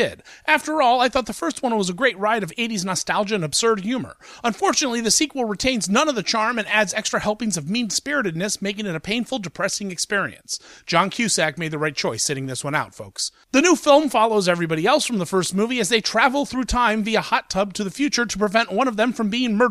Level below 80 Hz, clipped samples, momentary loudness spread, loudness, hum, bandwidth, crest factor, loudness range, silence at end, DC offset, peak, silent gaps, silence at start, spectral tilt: -46 dBFS; under 0.1%; 8 LU; -21 LUFS; none; 15.5 kHz; 18 dB; 4 LU; 0 s; under 0.1%; -2 dBFS; none; 0 s; -3 dB/octave